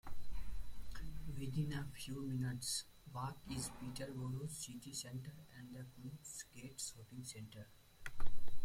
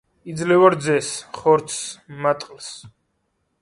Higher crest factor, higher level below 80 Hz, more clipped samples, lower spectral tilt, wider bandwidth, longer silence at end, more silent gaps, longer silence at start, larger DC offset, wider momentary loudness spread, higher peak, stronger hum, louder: about the same, 18 dB vs 20 dB; first, -52 dBFS vs -62 dBFS; neither; about the same, -4 dB/octave vs -4.5 dB/octave; first, 16 kHz vs 11.5 kHz; second, 0 s vs 0.75 s; neither; second, 0.05 s vs 0.25 s; neither; second, 13 LU vs 19 LU; second, -20 dBFS vs 0 dBFS; neither; second, -47 LUFS vs -20 LUFS